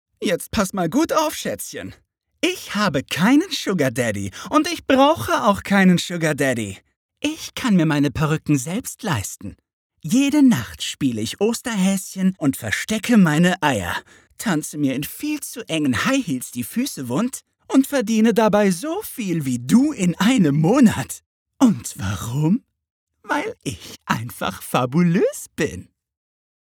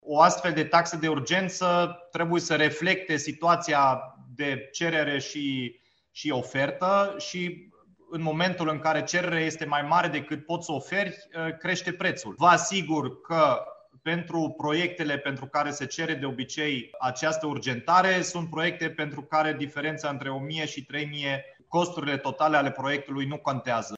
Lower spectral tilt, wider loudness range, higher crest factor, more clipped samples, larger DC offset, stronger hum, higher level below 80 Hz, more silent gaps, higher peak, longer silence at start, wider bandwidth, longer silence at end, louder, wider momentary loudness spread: about the same, -5 dB/octave vs -4 dB/octave; about the same, 5 LU vs 4 LU; about the same, 20 dB vs 22 dB; neither; neither; neither; first, -52 dBFS vs -70 dBFS; first, 6.96-7.09 s, 9.73-9.90 s, 21.26-21.46 s, 22.90-23.07 s vs none; first, 0 dBFS vs -6 dBFS; first, 0.2 s vs 0.05 s; first, 19.5 kHz vs 8.4 kHz; first, 0.95 s vs 0 s; first, -20 LUFS vs -27 LUFS; about the same, 11 LU vs 10 LU